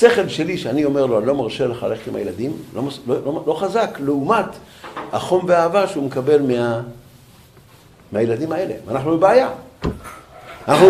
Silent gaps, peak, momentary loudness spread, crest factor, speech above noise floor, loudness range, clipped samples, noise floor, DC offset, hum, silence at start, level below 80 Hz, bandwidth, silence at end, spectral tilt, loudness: none; 0 dBFS; 13 LU; 18 dB; 28 dB; 3 LU; under 0.1%; -47 dBFS; under 0.1%; none; 0 s; -48 dBFS; 15 kHz; 0 s; -6 dB/octave; -19 LUFS